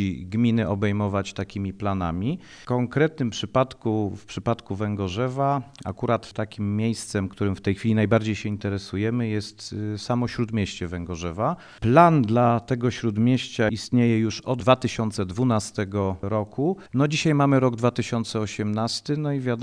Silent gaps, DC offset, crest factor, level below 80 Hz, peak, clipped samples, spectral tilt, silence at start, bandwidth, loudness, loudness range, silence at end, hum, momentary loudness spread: none; under 0.1%; 20 dB; -52 dBFS; -2 dBFS; under 0.1%; -6.5 dB/octave; 0 s; 10.5 kHz; -24 LUFS; 5 LU; 0 s; none; 9 LU